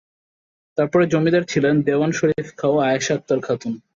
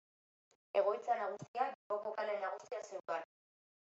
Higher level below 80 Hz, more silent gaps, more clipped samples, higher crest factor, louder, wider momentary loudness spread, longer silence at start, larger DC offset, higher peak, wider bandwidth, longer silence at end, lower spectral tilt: first, -58 dBFS vs under -90 dBFS; second, none vs 1.48-1.54 s, 1.75-1.90 s; neither; about the same, 14 dB vs 18 dB; first, -20 LUFS vs -40 LUFS; second, 6 LU vs 10 LU; about the same, 0.75 s vs 0.75 s; neither; first, -6 dBFS vs -22 dBFS; about the same, 7.6 kHz vs 8 kHz; second, 0.15 s vs 0.6 s; first, -6 dB/octave vs -2.5 dB/octave